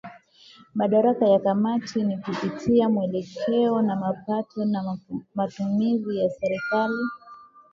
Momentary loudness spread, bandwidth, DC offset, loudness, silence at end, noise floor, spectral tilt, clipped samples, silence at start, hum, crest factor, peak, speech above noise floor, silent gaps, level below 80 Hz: 9 LU; 7.4 kHz; under 0.1%; -24 LUFS; 0.3 s; -52 dBFS; -7.5 dB/octave; under 0.1%; 0.05 s; none; 16 dB; -8 dBFS; 29 dB; none; -62 dBFS